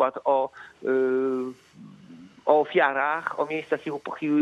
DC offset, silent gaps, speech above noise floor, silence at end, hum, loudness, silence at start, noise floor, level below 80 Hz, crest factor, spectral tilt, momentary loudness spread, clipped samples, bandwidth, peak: under 0.1%; none; 23 dB; 0 s; none; -25 LUFS; 0 s; -48 dBFS; -78 dBFS; 20 dB; -6.5 dB/octave; 11 LU; under 0.1%; 7.6 kHz; -6 dBFS